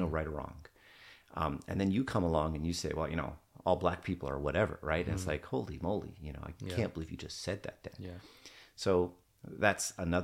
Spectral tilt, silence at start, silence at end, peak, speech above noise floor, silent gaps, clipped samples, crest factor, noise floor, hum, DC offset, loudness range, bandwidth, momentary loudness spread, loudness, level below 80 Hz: -5.5 dB/octave; 0 s; 0 s; -12 dBFS; 23 dB; none; under 0.1%; 24 dB; -58 dBFS; none; under 0.1%; 5 LU; 16.5 kHz; 16 LU; -35 LUFS; -50 dBFS